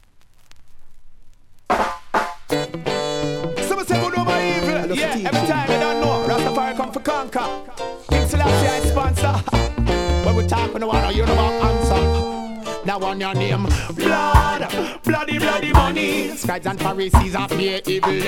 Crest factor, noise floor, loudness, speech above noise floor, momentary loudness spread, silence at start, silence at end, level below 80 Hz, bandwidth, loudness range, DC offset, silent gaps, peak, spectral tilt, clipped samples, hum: 20 dB; -47 dBFS; -20 LUFS; 28 dB; 7 LU; 0.45 s; 0 s; -26 dBFS; 16.5 kHz; 3 LU; under 0.1%; none; 0 dBFS; -5.5 dB/octave; under 0.1%; none